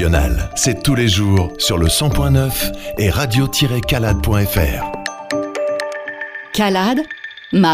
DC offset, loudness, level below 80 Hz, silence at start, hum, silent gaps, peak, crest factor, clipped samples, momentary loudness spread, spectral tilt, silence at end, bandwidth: under 0.1%; -17 LUFS; -26 dBFS; 0 s; none; none; -2 dBFS; 14 dB; under 0.1%; 9 LU; -4.5 dB/octave; 0 s; 16 kHz